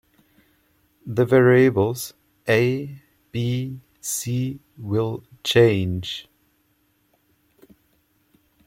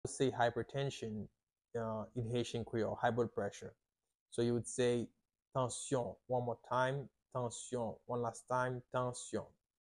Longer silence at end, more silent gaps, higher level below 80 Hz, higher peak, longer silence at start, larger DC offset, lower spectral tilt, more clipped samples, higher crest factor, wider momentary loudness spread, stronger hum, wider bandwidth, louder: first, 2.45 s vs 0.35 s; second, none vs 4.20-4.26 s; first, -60 dBFS vs -68 dBFS; first, -4 dBFS vs -20 dBFS; first, 1.05 s vs 0.05 s; neither; about the same, -5.5 dB/octave vs -5.5 dB/octave; neither; about the same, 20 dB vs 18 dB; first, 17 LU vs 10 LU; neither; first, 16.5 kHz vs 11.5 kHz; first, -21 LUFS vs -39 LUFS